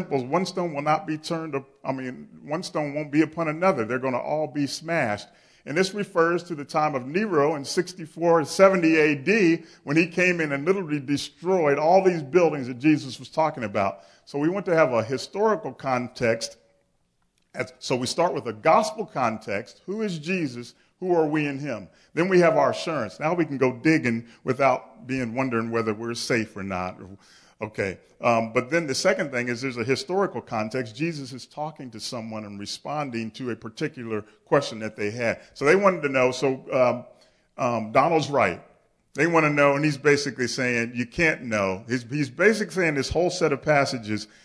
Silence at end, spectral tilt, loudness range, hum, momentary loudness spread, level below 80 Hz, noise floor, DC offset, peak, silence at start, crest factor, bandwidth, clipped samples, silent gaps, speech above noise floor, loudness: 0.2 s; -5.5 dB/octave; 7 LU; none; 13 LU; -58 dBFS; -69 dBFS; under 0.1%; -4 dBFS; 0 s; 20 dB; 11 kHz; under 0.1%; none; 45 dB; -24 LUFS